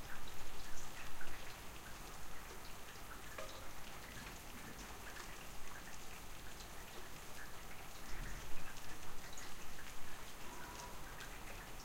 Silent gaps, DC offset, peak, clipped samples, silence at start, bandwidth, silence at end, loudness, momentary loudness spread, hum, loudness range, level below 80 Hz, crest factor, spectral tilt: none; under 0.1%; -26 dBFS; under 0.1%; 0 s; 16 kHz; 0 s; -52 LUFS; 2 LU; none; 1 LU; -54 dBFS; 16 dB; -3 dB/octave